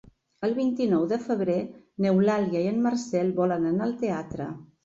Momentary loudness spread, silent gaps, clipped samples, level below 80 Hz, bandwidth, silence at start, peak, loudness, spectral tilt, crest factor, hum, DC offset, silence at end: 9 LU; none; under 0.1%; -62 dBFS; 7.8 kHz; 0.4 s; -12 dBFS; -26 LUFS; -7.5 dB/octave; 14 dB; none; under 0.1%; 0.2 s